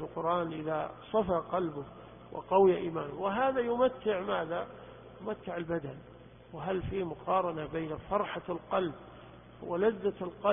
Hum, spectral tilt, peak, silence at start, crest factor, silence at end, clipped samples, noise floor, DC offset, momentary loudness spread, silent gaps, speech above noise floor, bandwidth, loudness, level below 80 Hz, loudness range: none; -10 dB/octave; -12 dBFS; 0 s; 20 dB; 0 s; under 0.1%; -52 dBFS; under 0.1%; 17 LU; none; 20 dB; 3.7 kHz; -33 LUFS; -58 dBFS; 6 LU